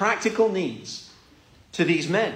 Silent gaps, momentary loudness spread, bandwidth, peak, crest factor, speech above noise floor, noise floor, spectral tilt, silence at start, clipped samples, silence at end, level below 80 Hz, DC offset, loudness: none; 15 LU; 10.5 kHz; -8 dBFS; 16 dB; 31 dB; -54 dBFS; -5 dB/octave; 0 s; under 0.1%; 0 s; -64 dBFS; under 0.1%; -23 LUFS